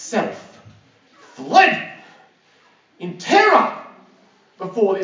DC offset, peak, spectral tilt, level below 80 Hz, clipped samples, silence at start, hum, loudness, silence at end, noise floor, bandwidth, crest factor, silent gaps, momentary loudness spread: under 0.1%; 0 dBFS; -3.5 dB/octave; -74 dBFS; under 0.1%; 0 s; none; -16 LUFS; 0 s; -56 dBFS; 7.6 kHz; 20 dB; none; 22 LU